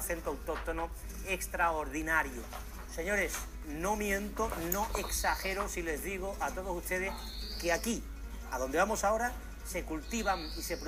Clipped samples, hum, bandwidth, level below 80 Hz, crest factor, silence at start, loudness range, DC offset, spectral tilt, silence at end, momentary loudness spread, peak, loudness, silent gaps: under 0.1%; none; 15.5 kHz; -44 dBFS; 20 dB; 0 s; 1 LU; under 0.1%; -3.5 dB/octave; 0 s; 10 LU; -14 dBFS; -35 LUFS; none